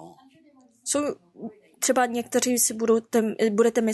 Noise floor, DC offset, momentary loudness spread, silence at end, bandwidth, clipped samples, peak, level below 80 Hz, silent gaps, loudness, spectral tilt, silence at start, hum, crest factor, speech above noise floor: -57 dBFS; under 0.1%; 17 LU; 0 s; 12.5 kHz; under 0.1%; -10 dBFS; -70 dBFS; none; -23 LUFS; -3 dB/octave; 0 s; none; 16 dB; 34 dB